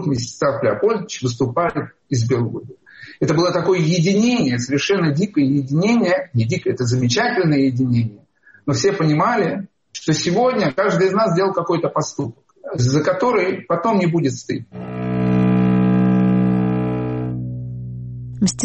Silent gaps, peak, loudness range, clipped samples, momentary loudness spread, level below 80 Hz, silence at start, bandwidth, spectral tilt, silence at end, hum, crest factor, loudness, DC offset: none; -6 dBFS; 2 LU; under 0.1%; 12 LU; -48 dBFS; 0 s; 8.4 kHz; -6 dB/octave; 0 s; none; 12 dB; -18 LUFS; under 0.1%